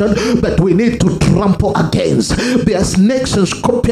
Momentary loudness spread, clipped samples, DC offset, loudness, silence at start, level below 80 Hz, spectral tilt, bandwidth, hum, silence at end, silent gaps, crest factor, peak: 2 LU; under 0.1%; under 0.1%; -13 LUFS; 0 s; -28 dBFS; -6 dB/octave; 13.5 kHz; none; 0 s; none; 12 dB; 0 dBFS